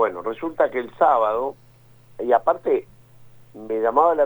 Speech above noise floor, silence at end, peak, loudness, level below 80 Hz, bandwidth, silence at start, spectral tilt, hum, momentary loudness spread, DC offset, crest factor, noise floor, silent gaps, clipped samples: 30 dB; 0 s; -4 dBFS; -21 LUFS; -60 dBFS; over 20 kHz; 0 s; -7 dB/octave; none; 11 LU; under 0.1%; 18 dB; -50 dBFS; none; under 0.1%